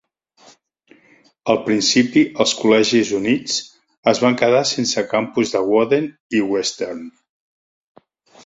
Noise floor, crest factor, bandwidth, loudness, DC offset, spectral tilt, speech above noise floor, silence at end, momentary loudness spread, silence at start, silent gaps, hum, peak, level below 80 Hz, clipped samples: -54 dBFS; 18 dB; 8 kHz; -18 LUFS; under 0.1%; -3.5 dB/octave; 37 dB; 1.35 s; 9 LU; 1.45 s; 3.98-4.03 s, 6.20-6.30 s; none; -2 dBFS; -60 dBFS; under 0.1%